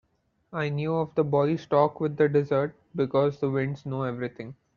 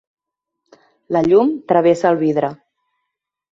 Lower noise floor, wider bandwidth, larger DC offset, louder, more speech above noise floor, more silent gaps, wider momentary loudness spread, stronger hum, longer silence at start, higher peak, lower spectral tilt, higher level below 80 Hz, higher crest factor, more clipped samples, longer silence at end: second, -65 dBFS vs -79 dBFS; second, 6.8 kHz vs 7.8 kHz; neither; second, -26 LUFS vs -16 LUFS; second, 39 dB vs 64 dB; neither; about the same, 9 LU vs 8 LU; neither; second, 0.5 s vs 1.1 s; second, -8 dBFS vs -2 dBFS; about the same, -7 dB/octave vs -7.5 dB/octave; second, -64 dBFS vs -58 dBFS; about the same, 18 dB vs 16 dB; neither; second, 0.25 s vs 0.95 s